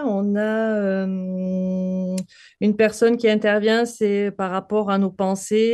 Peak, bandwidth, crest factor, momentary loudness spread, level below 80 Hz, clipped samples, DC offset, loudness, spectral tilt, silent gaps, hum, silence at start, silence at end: -6 dBFS; 12.5 kHz; 14 dB; 8 LU; -64 dBFS; under 0.1%; under 0.1%; -21 LUFS; -6 dB/octave; none; none; 0 s; 0 s